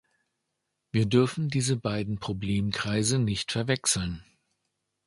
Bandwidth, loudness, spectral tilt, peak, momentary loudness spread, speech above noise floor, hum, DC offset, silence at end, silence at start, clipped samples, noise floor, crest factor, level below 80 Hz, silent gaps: 11.5 kHz; -27 LUFS; -4.5 dB/octave; -10 dBFS; 8 LU; 54 dB; none; under 0.1%; 0.85 s; 0.95 s; under 0.1%; -81 dBFS; 20 dB; -52 dBFS; none